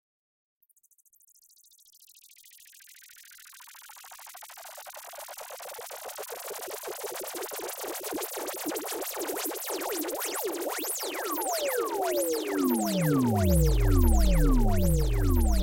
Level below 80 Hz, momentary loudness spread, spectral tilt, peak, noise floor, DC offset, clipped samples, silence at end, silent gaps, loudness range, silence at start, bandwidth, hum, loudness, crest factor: -32 dBFS; 22 LU; -5 dB/octave; -12 dBFS; -60 dBFS; under 0.1%; under 0.1%; 0 s; none; 21 LU; 3.3 s; 17 kHz; none; -29 LUFS; 18 dB